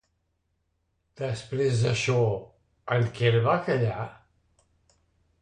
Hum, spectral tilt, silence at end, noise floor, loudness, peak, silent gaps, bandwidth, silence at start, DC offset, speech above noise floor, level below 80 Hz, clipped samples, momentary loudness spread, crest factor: none; -6 dB/octave; 1.25 s; -75 dBFS; -26 LUFS; -10 dBFS; none; 9.8 kHz; 1.2 s; under 0.1%; 50 dB; -58 dBFS; under 0.1%; 12 LU; 18 dB